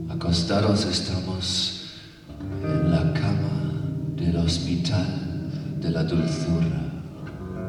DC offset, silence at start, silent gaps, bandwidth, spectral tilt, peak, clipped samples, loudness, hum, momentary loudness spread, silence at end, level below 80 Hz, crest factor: under 0.1%; 0 s; none; 11 kHz; -6 dB/octave; -8 dBFS; under 0.1%; -25 LUFS; none; 13 LU; 0 s; -42 dBFS; 16 dB